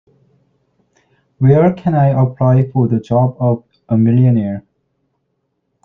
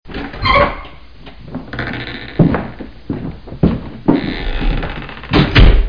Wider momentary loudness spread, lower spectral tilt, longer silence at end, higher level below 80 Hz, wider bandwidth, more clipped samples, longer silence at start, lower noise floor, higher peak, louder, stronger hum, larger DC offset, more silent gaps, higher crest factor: second, 7 LU vs 18 LU; first, -11.5 dB/octave vs -8 dB/octave; first, 1.25 s vs 0 s; second, -52 dBFS vs -20 dBFS; second, 3.8 kHz vs 5.2 kHz; neither; first, 1.4 s vs 0.05 s; first, -68 dBFS vs -37 dBFS; about the same, -2 dBFS vs 0 dBFS; about the same, -14 LUFS vs -16 LUFS; neither; second, under 0.1% vs 1%; neither; about the same, 14 dB vs 14 dB